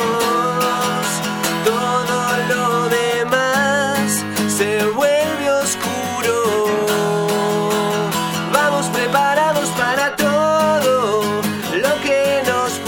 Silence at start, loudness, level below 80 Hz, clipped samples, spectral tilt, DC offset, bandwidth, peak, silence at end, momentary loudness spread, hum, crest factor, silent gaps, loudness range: 0 s; -17 LUFS; -60 dBFS; under 0.1%; -3.5 dB/octave; under 0.1%; 18 kHz; 0 dBFS; 0 s; 4 LU; none; 16 dB; none; 1 LU